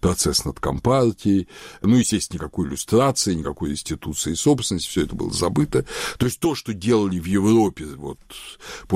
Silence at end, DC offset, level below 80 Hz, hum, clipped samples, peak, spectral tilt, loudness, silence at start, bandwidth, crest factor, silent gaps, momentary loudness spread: 0 s; under 0.1%; -40 dBFS; none; under 0.1%; -8 dBFS; -5 dB/octave; -21 LUFS; 0.05 s; 16 kHz; 14 dB; none; 15 LU